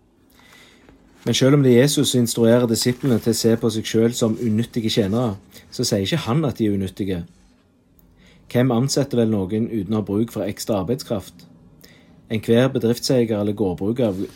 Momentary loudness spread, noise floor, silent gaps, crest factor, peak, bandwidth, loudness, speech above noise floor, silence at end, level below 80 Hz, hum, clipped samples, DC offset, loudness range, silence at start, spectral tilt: 10 LU; -56 dBFS; none; 18 dB; -4 dBFS; 16.5 kHz; -20 LUFS; 37 dB; 0.05 s; -56 dBFS; none; under 0.1%; under 0.1%; 6 LU; 1.25 s; -5.5 dB/octave